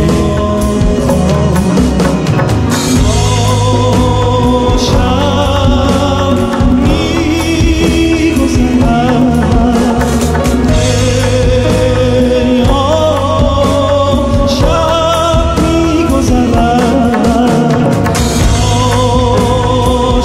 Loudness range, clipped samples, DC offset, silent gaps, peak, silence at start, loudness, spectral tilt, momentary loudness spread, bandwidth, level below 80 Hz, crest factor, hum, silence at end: 1 LU; under 0.1%; under 0.1%; none; 0 dBFS; 0 s; -10 LUFS; -6 dB/octave; 2 LU; 16 kHz; -18 dBFS; 10 dB; none; 0 s